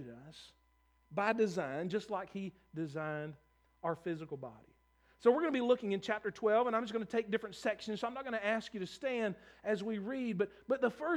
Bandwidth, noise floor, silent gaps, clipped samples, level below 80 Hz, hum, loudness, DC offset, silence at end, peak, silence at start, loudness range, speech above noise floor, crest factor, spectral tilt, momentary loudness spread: 11.5 kHz; -72 dBFS; none; under 0.1%; -74 dBFS; none; -37 LUFS; under 0.1%; 0 s; -16 dBFS; 0 s; 5 LU; 36 dB; 22 dB; -6 dB/octave; 13 LU